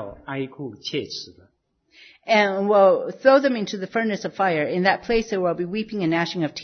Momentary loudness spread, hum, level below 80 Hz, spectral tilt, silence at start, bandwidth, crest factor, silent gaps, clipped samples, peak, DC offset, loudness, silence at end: 15 LU; none; -52 dBFS; -5.5 dB/octave; 0 s; 6.6 kHz; 20 dB; none; under 0.1%; -2 dBFS; under 0.1%; -21 LUFS; 0 s